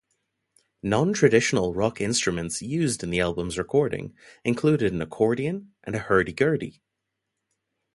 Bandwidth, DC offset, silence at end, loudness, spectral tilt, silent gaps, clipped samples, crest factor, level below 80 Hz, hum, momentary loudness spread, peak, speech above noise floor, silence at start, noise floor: 11.5 kHz; under 0.1%; 1.25 s; -24 LUFS; -5 dB/octave; none; under 0.1%; 20 dB; -50 dBFS; none; 12 LU; -4 dBFS; 58 dB; 0.85 s; -82 dBFS